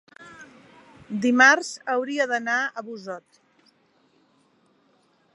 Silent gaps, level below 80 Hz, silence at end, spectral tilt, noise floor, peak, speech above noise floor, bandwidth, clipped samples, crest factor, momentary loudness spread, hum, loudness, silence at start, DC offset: none; -76 dBFS; 2.15 s; -3 dB/octave; -64 dBFS; -2 dBFS; 41 dB; 11.5 kHz; under 0.1%; 24 dB; 23 LU; none; -21 LUFS; 0.2 s; under 0.1%